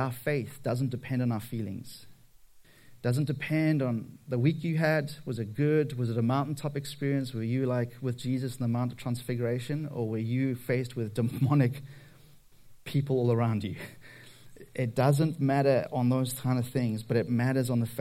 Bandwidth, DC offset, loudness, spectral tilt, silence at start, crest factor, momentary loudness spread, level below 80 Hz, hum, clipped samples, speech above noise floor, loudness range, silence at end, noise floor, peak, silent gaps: 16 kHz; under 0.1%; -30 LUFS; -7.5 dB/octave; 0 s; 18 dB; 10 LU; -64 dBFS; none; under 0.1%; 27 dB; 4 LU; 0 s; -56 dBFS; -10 dBFS; none